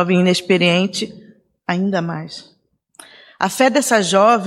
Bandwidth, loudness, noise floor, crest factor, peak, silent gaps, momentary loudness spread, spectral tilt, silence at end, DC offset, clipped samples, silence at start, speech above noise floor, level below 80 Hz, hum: 15.5 kHz; -16 LUFS; -47 dBFS; 16 dB; -2 dBFS; none; 16 LU; -4.5 dB/octave; 0 s; under 0.1%; under 0.1%; 0 s; 31 dB; -66 dBFS; none